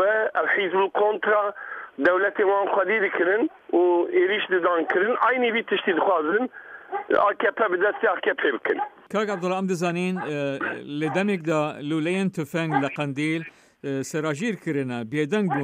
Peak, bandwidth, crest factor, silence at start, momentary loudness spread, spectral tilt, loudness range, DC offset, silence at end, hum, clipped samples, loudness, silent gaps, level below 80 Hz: -8 dBFS; 15 kHz; 16 dB; 0 s; 8 LU; -6 dB/octave; 5 LU; under 0.1%; 0 s; none; under 0.1%; -24 LUFS; none; -72 dBFS